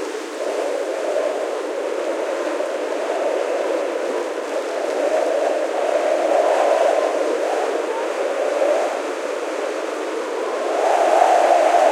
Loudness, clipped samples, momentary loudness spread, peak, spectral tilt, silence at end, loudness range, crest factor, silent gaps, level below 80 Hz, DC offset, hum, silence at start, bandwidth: -20 LUFS; under 0.1%; 9 LU; 0 dBFS; -1 dB/octave; 0 s; 4 LU; 20 dB; none; -80 dBFS; under 0.1%; none; 0 s; 14.5 kHz